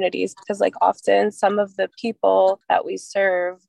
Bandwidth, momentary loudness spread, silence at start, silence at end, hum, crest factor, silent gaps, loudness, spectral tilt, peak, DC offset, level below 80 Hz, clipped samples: 11.5 kHz; 8 LU; 0 s; 0.15 s; none; 16 dB; none; -20 LUFS; -4.5 dB/octave; -4 dBFS; under 0.1%; -74 dBFS; under 0.1%